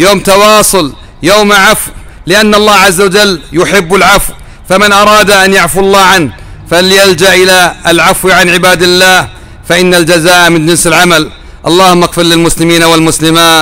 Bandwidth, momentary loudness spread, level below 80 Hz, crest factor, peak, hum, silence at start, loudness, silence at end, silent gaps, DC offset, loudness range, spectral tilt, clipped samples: over 20 kHz; 7 LU; -28 dBFS; 6 dB; 0 dBFS; none; 0 s; -4 LUFS; 0 s; none; 0.8%; 1 LU; -3 dB/octave; 2%